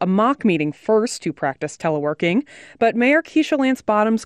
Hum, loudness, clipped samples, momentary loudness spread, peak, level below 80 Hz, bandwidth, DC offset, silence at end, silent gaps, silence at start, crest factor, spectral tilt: none; -19 LUFS; under 0.1%; 8 LU; -6 dBFS; -62 dBFS; 13 kHz; under 0.1%; 0 s; none; 0 s; 12 dB; -5.5 dB/octave